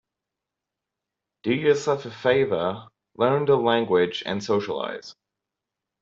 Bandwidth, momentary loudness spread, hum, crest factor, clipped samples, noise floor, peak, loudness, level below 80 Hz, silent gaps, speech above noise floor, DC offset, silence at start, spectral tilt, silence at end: 7.6 kHz; 10 LU; none; 20 dB; under 0.1%; -86 dBFS; -6 dBFS; -23 LUFS; -66 dBFS; none; 63 dB; under 0.1%; 1.45 s; -5.5 dB/octave; 0.9 s